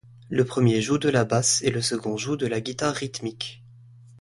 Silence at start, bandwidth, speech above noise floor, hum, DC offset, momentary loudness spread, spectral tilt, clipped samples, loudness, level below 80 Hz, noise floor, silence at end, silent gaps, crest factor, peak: 0.3 s; 11.5 kHz; 25 dB; none; under 0.1%; 11 LU; -4.5 dB/octave; under 0.1%; -24 LUFS; -58 dBFS; -49 dBFS; 0.6 s; none; 18 dB; -6 dBFS